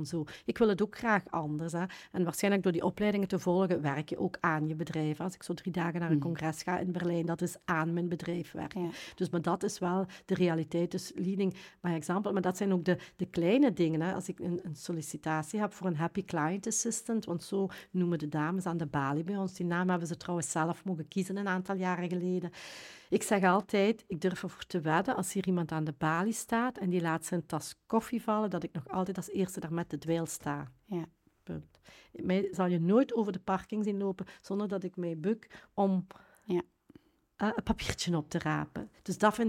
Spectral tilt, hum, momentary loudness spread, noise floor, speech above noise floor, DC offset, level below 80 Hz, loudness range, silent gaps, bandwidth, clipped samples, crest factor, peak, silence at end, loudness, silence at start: -5.5 dB/octave; none; 9 LU; -61 dBFS; 29 dB; under 0.1%; -62 dBFS; 4 LU; none; 16.5 kHz; under 0.1%; 22 dB; -10 dBFS; 0 s; -33 LUFS; 0 s